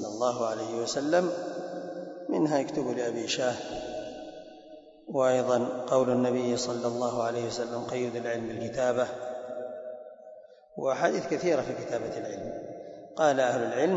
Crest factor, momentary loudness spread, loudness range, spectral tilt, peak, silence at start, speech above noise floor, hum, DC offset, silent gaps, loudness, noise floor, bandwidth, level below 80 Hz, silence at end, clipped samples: 20 dB; 16 LU; 4 LU; -4.5 dB/octave; -10 dBFS; 0 s; 22 dB; none; under 0.1%; none; -30 LUFS; -50 dBFS; 8 kHz; -66 dBFS; 0 s; under 0.1%